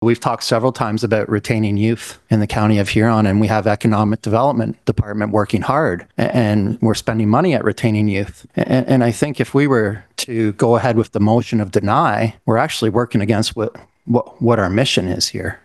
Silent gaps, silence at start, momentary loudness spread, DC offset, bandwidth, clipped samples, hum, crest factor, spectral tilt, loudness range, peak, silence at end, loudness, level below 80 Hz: none; 0 s; 5 LU; under 0.1%; 12.5 kHz; under 0.1%; none; 16 dB; -6 dB/octave; 1 LU; 0 dBFS; 0.1 s; -17 LUFS; -46 dBFS